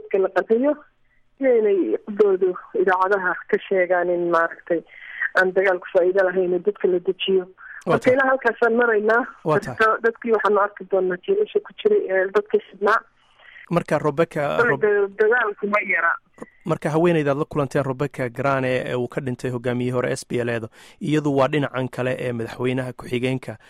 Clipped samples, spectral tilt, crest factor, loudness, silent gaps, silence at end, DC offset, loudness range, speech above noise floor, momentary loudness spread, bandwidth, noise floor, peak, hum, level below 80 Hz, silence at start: under 0.1%; -6.5 dB/octave; 14 dB; -21 LUFS; none; 0.15 s; under 0.1%; 4 LU; 27 dB; 8 LU; 12.5 kHz; -48 dBFS; -6 dBFS; none; -58 dBFS; 0.05 s